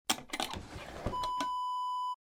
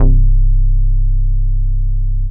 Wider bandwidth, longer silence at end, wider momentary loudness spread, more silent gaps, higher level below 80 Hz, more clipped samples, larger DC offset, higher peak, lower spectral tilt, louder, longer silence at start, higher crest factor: first, over 20 kHz vs 1 kHz; about the same, 0.05 s vs 0 s; first, 8 LU vs 5 LU; neither; second, -52 dBFS vs -10 dBFS; neither; neither; second, -12 dBFS vs 0 dBFS; second, -2.5 dB/octave vs -15.5 dB/octave; second, -36 LUFS vs -18 LUFS; about the same, 0.1 s vs 0 s; first, 26 dB vs 10 dB